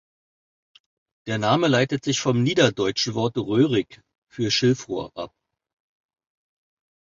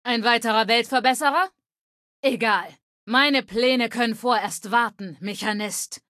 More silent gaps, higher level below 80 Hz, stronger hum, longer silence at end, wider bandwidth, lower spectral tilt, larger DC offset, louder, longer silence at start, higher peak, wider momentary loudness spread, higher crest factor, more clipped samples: second, 4.18-4.22 s vs 1.78-2.23 s, 2.83-3.07 s; first, -60 dBFS vs -68 dBFS; neither; first, 1.85 s vs 0.15 s; second, 7.8 kHz vs 14.5 kHz; first, -5 dB/octave vs -2.5 dB/octave; neither; about the same, -22 LUFS vs -22 LUFS; first, 1.25 s vs 0.05 s; about the same, -4 dBFS vs -4 dBFS; first, 17 LU vs 9 LU; about the same, 22 dB vs 18 dB; neither